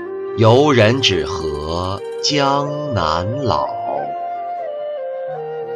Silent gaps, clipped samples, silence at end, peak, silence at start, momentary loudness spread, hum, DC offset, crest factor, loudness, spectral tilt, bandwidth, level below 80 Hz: none; under 0.1%; 0 s; -2 dBFS; 0 s; 13 LU; none; under 0.1%; 16 dB; -18 LUFS; -5 dB/octave; 10.5 kHz; -42 dBFS